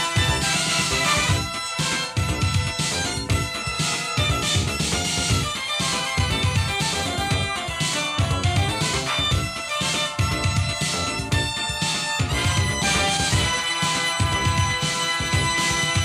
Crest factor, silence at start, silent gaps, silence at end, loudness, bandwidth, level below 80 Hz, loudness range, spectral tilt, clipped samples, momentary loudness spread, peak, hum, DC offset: 16 dB; 0 s; none; 0 s; -22 LUFS; 14 kHz; -36 dBFS; 2 LU; -3 dB/octave; under 0.1%; 4 LU; -8 dBFS; none; under 0.1%